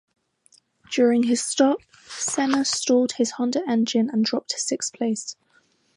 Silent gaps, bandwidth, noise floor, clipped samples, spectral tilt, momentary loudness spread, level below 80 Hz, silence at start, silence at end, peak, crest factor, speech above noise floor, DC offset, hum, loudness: none; 11.5 kHz; -63 dBFS; under 0.1%; -3 dB/octave; 9 LU; -72 dBFS; 0.9 s; 0.65 s; -6 dBFS; 16 dB; 41 dB; under 0.1%; none; -23 LUFS